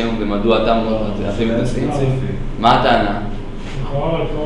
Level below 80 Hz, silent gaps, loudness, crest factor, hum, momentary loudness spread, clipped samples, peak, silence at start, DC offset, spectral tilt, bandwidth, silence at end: -26 dBFS; none; -17 LUFS; 16 dB; none; 11 LU; under 0.1%; 0 dBFS; 0 s; under 0.1%; -7 dB/octave; 10.5 kHz; 0 s